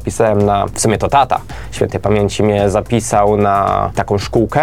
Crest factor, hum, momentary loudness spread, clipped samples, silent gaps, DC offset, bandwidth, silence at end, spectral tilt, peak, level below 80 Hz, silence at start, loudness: 14 dB; none; 5 LU; under 0.1%; none; 1%; 16 kHz; 0 s; -5.5 dB/octave; 0 dBFS; -32 dBFS; 0 s; -14 LUFS